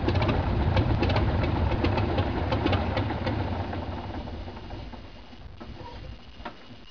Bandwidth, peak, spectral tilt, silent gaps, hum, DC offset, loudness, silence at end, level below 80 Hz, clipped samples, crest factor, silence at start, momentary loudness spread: 5.4 kHz; -12 dBFS; -8 dB/octave; none; none; 0.4%; -27 LUFS; 0 s; -34 dBFS; under 0.1%; 16 dB; 0 s; 19 LU